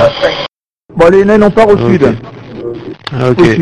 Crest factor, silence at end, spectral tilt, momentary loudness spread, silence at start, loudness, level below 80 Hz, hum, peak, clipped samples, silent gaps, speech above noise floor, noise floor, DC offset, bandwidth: 10 dB; 0 s; -7 dB/octave; 17 LU; 0 s; -8 LUFS; -34 dBFS; none; 0 dBFS; 2%; 0.48-0.60 s, 0.72-0.89 s; 32 dB; -39 dBFS; under 0.1%; 10.5 kHz